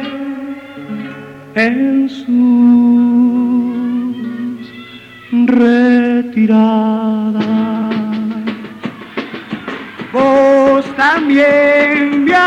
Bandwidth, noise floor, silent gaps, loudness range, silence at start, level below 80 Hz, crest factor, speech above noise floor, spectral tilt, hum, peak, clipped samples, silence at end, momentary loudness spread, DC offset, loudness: 7.4 kHz; -34 dBFS; none; 4 LU; 0 s; -54 dBFS; 10 dB; 24 dB; -7 dB/octave; none; -2 dBFS; under 0.1%; 0 s; 17 LU; under 0.1%; -12 LUFS